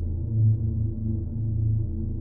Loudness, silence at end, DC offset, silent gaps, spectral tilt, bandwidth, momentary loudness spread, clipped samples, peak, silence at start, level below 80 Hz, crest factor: -26 LUFS; 0 s; under 0.1%; none; -16 dB/octave; 1 kHz; 6 LU; under 0.1%; -14 dBFS; 0 s; -34 dBFS; 12 dB